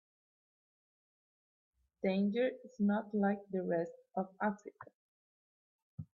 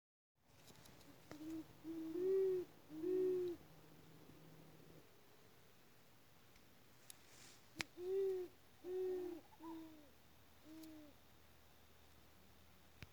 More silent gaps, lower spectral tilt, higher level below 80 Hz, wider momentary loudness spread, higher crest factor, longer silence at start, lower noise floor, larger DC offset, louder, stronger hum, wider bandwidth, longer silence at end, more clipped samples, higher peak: first, 4.95-5.98 s vs none; first, -8.5 dB/octave vs -5.5 dB/octave; about the same, -80 dBFS vs -80 dBFS; second, 14 LU vs 26 LU; second, 18 dB vs 30 dB; first, 2.05 s vs 0.55 s; first, under -90 dBFS vs -69 dBFS; neither; first, -36 LUFS vs -45 LUFS; neither; second, 7 kHz vs over 20 kHz; about the same, 0.1 s vs 0.05 s; neither; second, -22 dBFS vs -18 dBFS